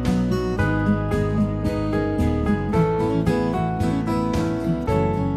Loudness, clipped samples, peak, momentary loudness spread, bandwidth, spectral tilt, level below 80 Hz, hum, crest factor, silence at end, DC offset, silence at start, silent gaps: -22 LUFS; under 0.1%; -8 dBFS; 2 LU; 13.5 kHz; -8 dB/octave; -32 dBFS; none; 14 dB; 0 s; under 0.1%; 0 s; none